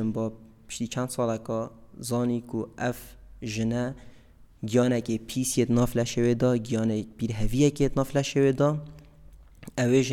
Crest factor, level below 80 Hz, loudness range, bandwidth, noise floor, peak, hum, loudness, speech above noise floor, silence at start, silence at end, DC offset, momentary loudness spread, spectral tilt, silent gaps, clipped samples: 16 dB; -44 dBFS; 6 LU; 17 kHz; -53 dBFS; -10 dBFS; none; -27 LUFS; 27 dB; 0 s; 0 s; under 0.1%; 12 LU; -6 dB/octave; none; under 0.1%